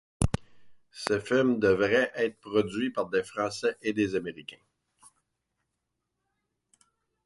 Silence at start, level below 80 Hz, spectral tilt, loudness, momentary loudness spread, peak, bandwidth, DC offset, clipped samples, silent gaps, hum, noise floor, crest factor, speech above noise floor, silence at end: 0.2 s; -48 dBFS; -5.5 dB/octave; -28 LUFS; 13 LU; -8 dBFS; 11.5 kHz; under 0.1%; under 0.1%; none; none; -82 dBFS; 22 dB; 55 dB; 2.7 s